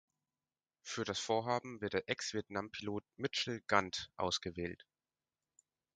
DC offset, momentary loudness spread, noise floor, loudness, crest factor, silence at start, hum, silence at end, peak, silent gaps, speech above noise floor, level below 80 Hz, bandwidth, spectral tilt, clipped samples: under 0.1%; 10 LU; under -90 dBFS; -39 LUFS; 28 dB; 0.85 s; none; 1.2 s; -14 dBFS; none; over 51 dB; -66 dBFS; 9.4 kHz; -3.5 dB/octave; under 0.1%